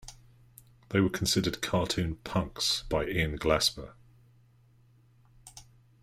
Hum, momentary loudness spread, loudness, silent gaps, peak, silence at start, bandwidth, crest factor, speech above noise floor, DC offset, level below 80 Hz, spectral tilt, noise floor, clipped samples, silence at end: none; 23 LU; -29 LUFS; none; -12 dBFS; 0.05 s; 16 kHz; 20 dB; 32 dB; under 0.1%; -48 dBFS; -4 dB/octave; -62 dBFS; under 0.1%; 0.4 s